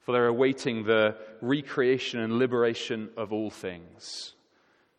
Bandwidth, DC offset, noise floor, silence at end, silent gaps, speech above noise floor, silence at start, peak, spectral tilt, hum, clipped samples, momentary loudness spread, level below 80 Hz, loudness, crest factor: 11 kHz; under 0.1%; -66 dBFS; 0.7 s; none; 39 dB; 0.1 s; -10 dBFS; -5.5 dB/octave; none; under 0.1%; 15 LU; -72 dBFS; -27 LUFS; 18 dB